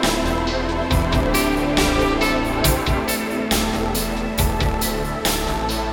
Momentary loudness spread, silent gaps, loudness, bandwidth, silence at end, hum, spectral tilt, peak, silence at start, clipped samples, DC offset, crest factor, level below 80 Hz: 4 LU; none; -20 LUFS; 19 kHz; 0 s; none; -4.5 dB/octave; -4 dBFS; 0 s; under 0.1%; under 0.1%; 14 dB; -26 dBFS